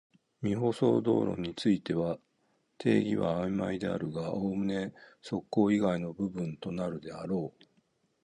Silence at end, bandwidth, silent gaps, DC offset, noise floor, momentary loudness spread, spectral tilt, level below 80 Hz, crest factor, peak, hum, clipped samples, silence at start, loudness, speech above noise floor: 0.75 s; 11 kHz; none; under 0.1%; -74 dBFS; 10 LU; -7.5 dB/octave; -62 dBFS; 18 dB; -12 dBFS; none; under 0.1%; 0.4 s; -32 LUFS; 43 dB